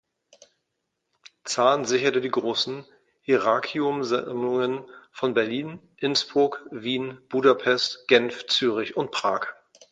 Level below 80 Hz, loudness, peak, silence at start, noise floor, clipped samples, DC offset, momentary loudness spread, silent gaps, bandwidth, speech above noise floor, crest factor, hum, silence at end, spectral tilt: -72 dBFS; -24 LUFS; -4 dBFS; 1.45 s; -79 dBFS; under 0.1%; under 0.1%; 11 LU; none; 9.2 kHz; 55 dB; 20 dB; none; 0.4 s; -3.5 dB/octave